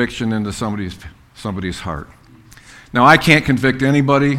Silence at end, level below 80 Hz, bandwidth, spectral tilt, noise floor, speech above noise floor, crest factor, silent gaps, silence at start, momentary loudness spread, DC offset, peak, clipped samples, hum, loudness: 0 s; -40 dBFS; 16 kHz; -6 dB/octave; -44 dBFS; 28 dB; 16 dB; none; 0 s; 18 LU; under 0.1%; 0 dBFS; 0.1%; none; -15 LUFS